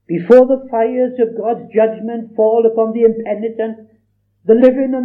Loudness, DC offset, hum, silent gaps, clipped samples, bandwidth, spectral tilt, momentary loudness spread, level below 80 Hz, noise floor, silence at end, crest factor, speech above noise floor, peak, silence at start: -14 LUFS; under 0.1%; 50 Hz at -65 dBFS; none; 0.5%; 4.8 kHz; -9 dB/octave; 13 LU; -58 dBFS; -60 dBFS; 0 s; 14 dB; 46 dB; 0 dBFS; 0.1 s